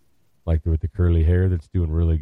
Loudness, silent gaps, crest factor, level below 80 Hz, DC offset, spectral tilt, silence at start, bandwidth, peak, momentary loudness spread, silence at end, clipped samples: -22 LUFS; none; 12 dB; -26 dBFS; under 0.1%; -10.5 dB/octave; 0.45 s; 3.7 kHz; -10 dBFS; 7 LU; 0 s; under 0.1%